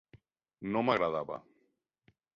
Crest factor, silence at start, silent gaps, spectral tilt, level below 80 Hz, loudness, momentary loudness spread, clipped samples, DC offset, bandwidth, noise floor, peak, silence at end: 22 dB; 0.15 s; none; -4 dB/octave; -70 dBFS; -32 LUFS; 15 LU; under 0.1%; under 0.1%; 7.4 kHz; -77 dBFS; -14 dBFS; 0.95 s